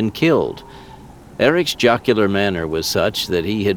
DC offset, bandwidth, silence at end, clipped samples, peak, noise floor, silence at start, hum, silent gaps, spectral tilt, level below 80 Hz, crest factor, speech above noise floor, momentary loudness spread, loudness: under 0.1%; 19.5 kHz; 0 s; under 0.1%; -2 dBFS; -40 dBFS; 0 s; none; none; -5 dB/octave; -46 dBFS; 16 dB; 22 dB; 6 LU; -17 LUFS